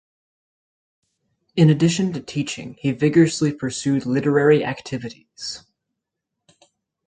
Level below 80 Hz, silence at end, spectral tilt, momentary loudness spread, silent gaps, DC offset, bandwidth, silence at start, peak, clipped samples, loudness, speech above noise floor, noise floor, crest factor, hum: -60 dBFS; 1.5 s; -6 dB/octave; 15 LU; none; under 0.1%; 9.4 kHz; 1.55 s; -4 dBFS; under 0.1%; -20 LUFS; 62 dB; -81 dBFS; 18 dB; none